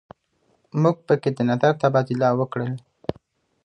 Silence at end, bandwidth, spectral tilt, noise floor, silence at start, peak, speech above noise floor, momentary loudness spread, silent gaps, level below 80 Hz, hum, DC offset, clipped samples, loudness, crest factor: 0.55 s; 9.4 kHz; -8 dB/octave; -66 dBFS; 0.75 s; -4 dBFS; 46 dB; 13 LU; none; -60 dBFS; none; under 0.1%; under 0.1%; -22 LUFS; 18 dB